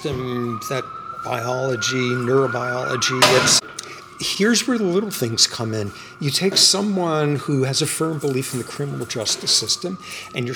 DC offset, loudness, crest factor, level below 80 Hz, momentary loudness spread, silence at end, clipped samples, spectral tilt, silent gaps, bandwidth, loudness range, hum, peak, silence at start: under 0.1%; -19 LUFS; 20 dB; -58 dBFS; 13 LU; 0 s; under 0.1%; -3 dB/octave; none; 19.5 kHz; 3 LU; none; -2 dBFS; 0 s